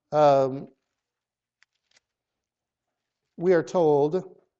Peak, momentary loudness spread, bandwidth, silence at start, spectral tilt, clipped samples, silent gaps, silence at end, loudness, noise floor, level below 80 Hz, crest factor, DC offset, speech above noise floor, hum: -8 dBFS; 10 LU; 7.8 kHz; 0.1 s; -7 dB/octave; under 0.1%; none; 0.3 s; -23 LUFS; -89 dBFS; -72 dBFS; 18 dB; under 0.1%; 68 dB; none